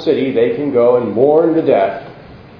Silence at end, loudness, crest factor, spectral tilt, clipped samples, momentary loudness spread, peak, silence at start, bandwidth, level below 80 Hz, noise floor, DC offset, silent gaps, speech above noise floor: 0.2 s; -13 LUFS; 14 dB; -9 dB/octave; under 0.1%; 4 LU; 0 dBFS; 0 s; 5.4 kHz; -52 dBFS; -36 dBFS; under 0.1%; none; 24 dB